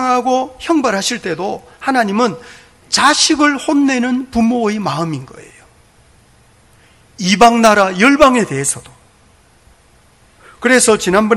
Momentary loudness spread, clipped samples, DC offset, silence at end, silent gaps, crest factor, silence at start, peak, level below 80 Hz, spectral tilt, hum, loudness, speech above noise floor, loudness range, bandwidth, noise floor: 12 LU; 0.4%; under 0.1%; 0 s; none; 14 dB; 0 s; 0 dBFS; -44 dBFS; -3.5 dB/octave; none; -13 LUFS; 36 dB; 5 LU; 16.5 kHz; -49 dBFS